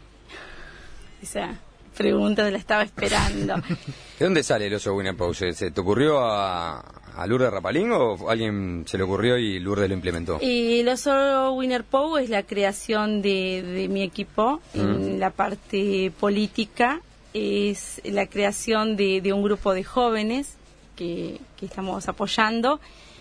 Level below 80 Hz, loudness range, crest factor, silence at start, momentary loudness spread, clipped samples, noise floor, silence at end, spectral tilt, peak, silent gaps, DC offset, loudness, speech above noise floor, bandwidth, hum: -46 dBFS; 2 LU; 20 dB; 0.3 s; 12 LU; under 0.1%; -44 dBFS; 0.1 s; -5 dB/octave; -4 dBFS; none; under 0.1%; -24 LUFS; 20 dB; 11 kHz; none